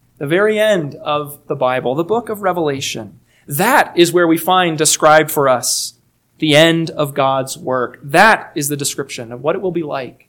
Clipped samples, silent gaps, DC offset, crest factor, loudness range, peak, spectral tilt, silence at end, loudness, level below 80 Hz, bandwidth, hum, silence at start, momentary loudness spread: 0.2%; none; under 0.1%; 16 dB; 5 LU; 0 dBFS; -3.5 dB/octave; 0.15 s; -15 LUFS; -58 dBFS; 19.5 kHz; none; 0.2 s; 11 LU